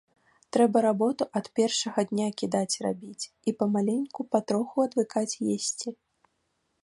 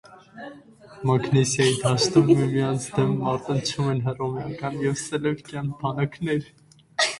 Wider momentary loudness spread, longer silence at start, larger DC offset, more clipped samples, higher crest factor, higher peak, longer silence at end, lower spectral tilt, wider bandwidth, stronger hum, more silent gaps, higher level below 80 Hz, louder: about the same, 9 LU vs 11 LU; first, 0.55 s vs 0.1 s; neither; neither; about the same, 20 dB vs 20 dB; second, -8 dBFS vs -4 dBFS; first, 0.9 s vs 0 s; about the same, -4.5 dB/octave vs -5 dB/octave; about the same, 11.5 kHz vs 11.5 kHz; neither; neither; second, -74 dBFS vs -56 dBFS; second, -28 LUFS vs -24 LUFS